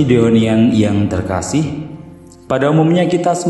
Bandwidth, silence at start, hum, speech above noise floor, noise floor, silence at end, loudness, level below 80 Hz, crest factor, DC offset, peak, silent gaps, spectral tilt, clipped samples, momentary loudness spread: 11.5 kHz; 0 s; none; 24 dB; -37 dBFS; 0 s; -14 LUFS; -42 dBFS; 14 dB; under 0.1%; 0 dBFS; none; -6.5 dB/octave; under 0.1%; 12 LU